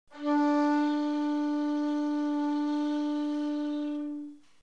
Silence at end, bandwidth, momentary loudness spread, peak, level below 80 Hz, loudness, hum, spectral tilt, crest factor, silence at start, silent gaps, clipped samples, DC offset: 0.25 s; 7.2 kHz; 8 LU; -18 dBFS; -80 dBFS; -29 LUFS; none; -4 dB/octave; 12 dB; 0.1 s; none; under 0.1%; 0.1%